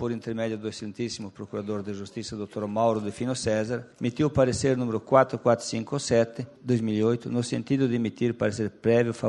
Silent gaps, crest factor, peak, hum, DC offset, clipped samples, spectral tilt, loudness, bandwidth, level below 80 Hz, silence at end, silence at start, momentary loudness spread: none; 22 dB; -4 dBFS; none; under 0.1%; under 0.1%; -6 dB/octave; -27 LUFS; 11 kHz; -56 dBFS; 0 s; 0 s; 11 LU